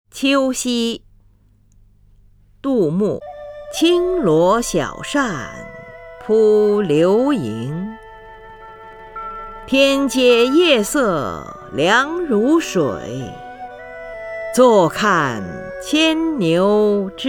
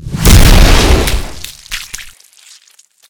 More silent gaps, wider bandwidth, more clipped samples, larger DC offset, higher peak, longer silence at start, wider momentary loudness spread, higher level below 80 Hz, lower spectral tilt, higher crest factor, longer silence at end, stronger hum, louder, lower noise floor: neither; about the same, 19.5 kHz vs over 20 kHz; second, under 0.1% vs 3%; neither; about the same, 0 dBFS vs 0 dBFS; first, 0.15 s vs 0 s; about the same, 20 LU vs 20 LU; second, -46 dBFS vs -12 dBFS; about the same, -4.5 dB/octave vs -4 dB/octave; first, 18 dB vs 10 dB; second, 0 s vs 1 s; neither; second, -16 LUFS vs -9 LUFS; first, -53 dBFS vs -47 dBFS